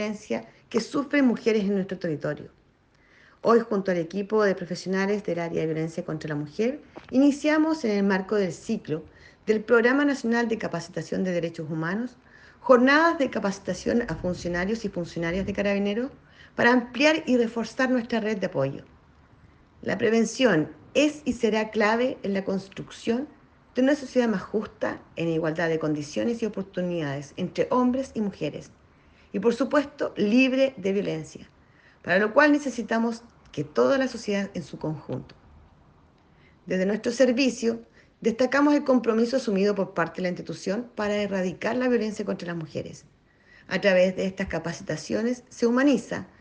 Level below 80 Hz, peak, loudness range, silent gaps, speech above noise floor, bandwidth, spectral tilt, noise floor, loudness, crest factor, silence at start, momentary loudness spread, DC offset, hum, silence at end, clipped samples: -56 dBFS; -4 dBFS; 4 LU; none; 36 dB; 9.6 kHz; -5.5 dB/octave; -61 dBFS; -25 LUFS; 22 dB; 0 s; 12 LU; under 0.1%; none; 0.15 s; under 0.1%